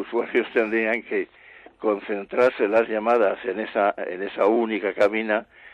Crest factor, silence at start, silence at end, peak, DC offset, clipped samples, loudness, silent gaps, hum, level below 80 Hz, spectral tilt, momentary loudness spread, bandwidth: 16 dB; 0 s; 0.05 s; -8 dBFS; under 0.1%; under 0.1%; -23 LUFS; none; none; -66 dBFS; -6 dB/octave; 8 LU; 8.6 kHz